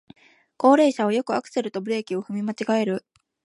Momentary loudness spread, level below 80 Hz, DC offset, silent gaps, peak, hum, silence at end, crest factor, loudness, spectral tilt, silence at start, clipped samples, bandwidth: 11 LU; -76 dBFS; under 0.1%; none; -4 dBFS; none; 0.45 s; 20 dB; -23 LUFS; -5.5 dB/octave; 0.6 s; under 0.1%; 11.5 kHz